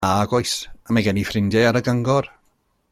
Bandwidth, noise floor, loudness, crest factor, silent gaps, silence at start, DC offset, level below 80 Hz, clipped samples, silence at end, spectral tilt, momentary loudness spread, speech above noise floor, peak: 16 kHz; -65 dBFS; -20 LUFS; 16 dB; none; 0 s; under 0.1%; -48 dBFS; under 0.1%; 0.65 s; -5.5 dB/octave; 7 LU; 45 dB; -4 dBFS